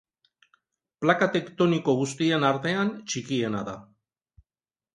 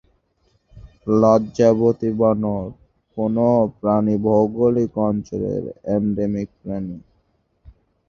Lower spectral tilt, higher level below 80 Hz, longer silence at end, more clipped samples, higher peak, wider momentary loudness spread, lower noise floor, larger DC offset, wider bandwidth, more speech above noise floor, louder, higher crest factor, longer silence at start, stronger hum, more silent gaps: second, -5 dB/octave vs -9 dB/octave; second, -66 dBFS vs -48 dBFS; first, 1.1 s vs 0.4 s; neither; second, -6 dBFS vs -2 dBFS; second, 10 LU vs 13 LU; first, under -90 dBFS vs -65 dBFS; neither; first, 11.5 kHz vs 7 kHz; first, over 65 dB vs 46 dB; second, -25 LUFS vs -19 LUFS; about the same, 22 dB vs 18 dB; first, 1 s vs 0.75 s; neither; neither